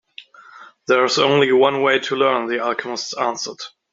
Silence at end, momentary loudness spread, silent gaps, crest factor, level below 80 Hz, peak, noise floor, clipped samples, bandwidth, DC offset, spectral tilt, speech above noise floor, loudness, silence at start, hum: 0.25 s; 12 LU; none; 18 dB; -66 dBFS; -2 dBFS; -44 dBFS; under 0.1%; 7.8 kHz; under 0.1%; -3.5 dB/octave; 26 dB; -18 LUFS; 0.2 s; none